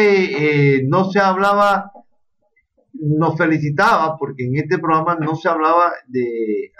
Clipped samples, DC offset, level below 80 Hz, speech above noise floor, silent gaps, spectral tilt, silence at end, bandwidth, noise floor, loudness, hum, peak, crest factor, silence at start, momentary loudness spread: under 0.1%; under 0.1%; -58 dBFS; 49 dB; none; -7.5 dB/octave; 0.15 s; 12 kHz; -65 dBFS; -16 LUFS; none; -4 dBFS; 14 dB; 0 s; 8 LU